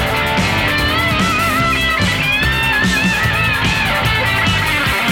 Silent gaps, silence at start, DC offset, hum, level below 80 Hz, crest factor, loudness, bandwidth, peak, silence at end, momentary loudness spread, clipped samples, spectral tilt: none; 0 s; under 0.1%; none; -28 dBFS; 10 dB; -14 LUFS; 18 kHz; -6 dBFS; 0 s; 1 LU; under 0.1%; -4 dB/octave